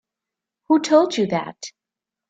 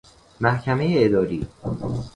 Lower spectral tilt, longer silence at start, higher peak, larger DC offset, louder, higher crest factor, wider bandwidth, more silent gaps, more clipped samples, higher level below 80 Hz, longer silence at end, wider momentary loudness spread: second, -5 dB/octave vs -8 dB/octave; first, 0.7 s vs 0.4 s; about the same, -4 dBFS vs -2 dBFS; neither; first, -19 LUFS vs -22 LUFS; about the same, 18 dB vs 20 dB; second, 9 kHz vs 10.5 kHz; neither; neither; second, -68 dBFS vs -44 dBFS; first, 0.6 s vs 0.05 s; first, 20 LU vs 11 LU